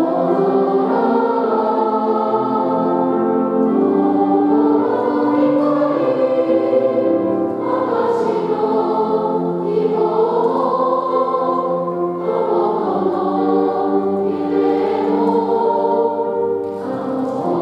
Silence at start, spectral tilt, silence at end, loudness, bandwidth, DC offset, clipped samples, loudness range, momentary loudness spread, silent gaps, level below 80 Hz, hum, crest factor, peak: 0 s; -9 dB/octave; 0 s; -17 LUFS; 5.8 kHz; under 0.1%; under 0.1%; 2 LU; 4 LU; none; -68 dBFS; none; 12 dB; -4 dBFS